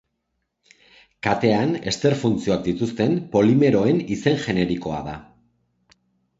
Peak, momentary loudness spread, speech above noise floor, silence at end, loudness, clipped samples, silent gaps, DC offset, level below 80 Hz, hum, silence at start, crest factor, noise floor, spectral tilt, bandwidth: -2 dBFS; 10 LU; 56 dB; 1.15 s; -21 LUFS; under 0.1%; none; under 0.1%; -50 dBFS; none; 1.25 s; 20 dB; -76 dBFS; -6.5 dB/octave; 8 kHz